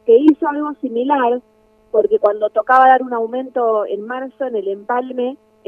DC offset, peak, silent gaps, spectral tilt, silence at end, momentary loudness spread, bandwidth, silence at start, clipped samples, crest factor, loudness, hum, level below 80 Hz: under 0.1%; 0 dBFS; none; -6.5 dB/octave; 0.3 s; 12 LU; 4.6 kHz; 0.05 s; under 0.1%; 16 dB; -17 LUFS; none; -64 dBFS